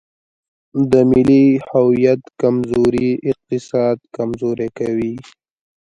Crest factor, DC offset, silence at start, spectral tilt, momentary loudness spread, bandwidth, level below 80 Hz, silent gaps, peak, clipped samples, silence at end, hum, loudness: 16 dB; under 0.1%; 0.75 s; -8.5 dB/octave; 11 LU; 10.5 kHz; -48 dBFS; none; 0 dBFS; under 0.1%; 0.7 s; none; -16 LUFS